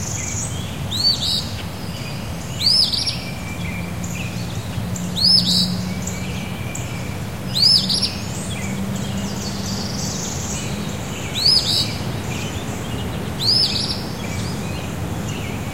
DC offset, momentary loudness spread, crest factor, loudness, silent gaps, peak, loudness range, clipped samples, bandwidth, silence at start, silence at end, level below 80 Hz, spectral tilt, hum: 1%; 13 LU; 20 dB; -20 LUFS; none; -2 dBFS; 4 LU; under 0.1%; 16 kHz; 0 s; 0 s; -38 dBFS; -3.5 dB/octave; none